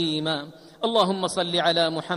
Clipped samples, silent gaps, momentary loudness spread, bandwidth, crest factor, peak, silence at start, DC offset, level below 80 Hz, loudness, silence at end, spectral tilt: under 0.1%; none; 9 LU; 14 kHz; 16 dB; -8 dBFS; 0 s; under 0.1%; -66 dBFS; -23 LUFS; 0 s; -4 dB/octave